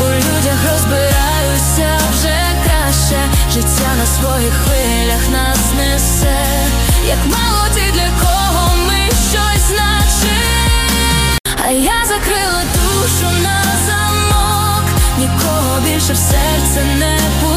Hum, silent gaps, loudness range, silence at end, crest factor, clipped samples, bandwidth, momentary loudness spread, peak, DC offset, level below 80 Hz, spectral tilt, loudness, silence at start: none; 11.40-11.44 s; 1 LU; 0 s; 12 dB; under 0.1%; 16 kHz; 1 LU; 0 dBFS; under 0.1%; -16 dBFS; -3.5 dB/octave; -12 LUFS; 0 s